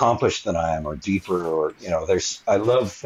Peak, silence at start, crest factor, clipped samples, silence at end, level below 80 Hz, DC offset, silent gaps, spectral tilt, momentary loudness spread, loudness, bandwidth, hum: -6 dBFS; 0 s; 16 dB; under 0.1%; 0.05 s; -46 dBFS; under 0.1%; none; -5 dB/octave; 6 LU; -23 LUFS; 12.5 kHz; none